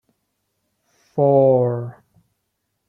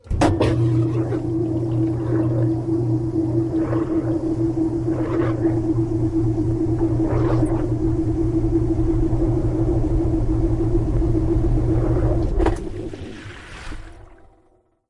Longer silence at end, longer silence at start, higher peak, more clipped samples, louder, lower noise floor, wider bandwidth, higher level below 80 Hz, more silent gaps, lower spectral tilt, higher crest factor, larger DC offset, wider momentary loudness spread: first, 1 s vs 0.75 s; first, 1.15 s vs 0.05 s; about the same, -4 dBFS vs -6 dBFS; neither; first, -18 LUFS vs -21 LUFS; first, -74 dBFS vs -59 dBFS; second, 3.8 kHz vs 10.5 kHz; second, -66 dBFS vs -28 dBFS; neither; first, -11.5 dB/octave vs -9 dB/octave; about the same, 18 dB vs 14 dB; neither; first, 16 LU vs 3 LU